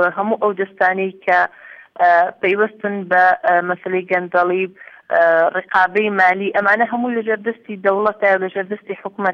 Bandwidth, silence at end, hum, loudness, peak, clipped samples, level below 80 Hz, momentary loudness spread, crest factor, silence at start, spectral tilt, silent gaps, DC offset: 6.4 kHz; 0 s; none; -17 LUFS; -2 dBFS; under 0.1%; -66 dBFS; 9 LU; 14 dB; 0 s; -7 dB/octave; none; under 0.1%